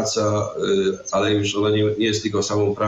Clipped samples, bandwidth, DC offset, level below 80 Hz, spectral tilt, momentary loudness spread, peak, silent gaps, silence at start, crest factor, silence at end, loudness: under 0.1%; 8.6 kHz; under 0.1%; -56 dBFS; -4.5 dB/octave; 3 LU; -10 dBFS; none; 0 s; 12 dB; 0 s; -21 LUFS